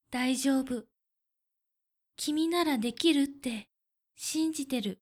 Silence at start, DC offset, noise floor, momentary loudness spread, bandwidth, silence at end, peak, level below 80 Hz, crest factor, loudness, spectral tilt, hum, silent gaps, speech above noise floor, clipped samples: 0.1 s; under 0.1%; -85 dBFS; 11 LU; 16.5 kHz; 0.05 s; -12 dBFS; -70 dBFS; 20 dB; -30 LUFS; -3 dB/octave; none; none; 55 dB; under 0.1%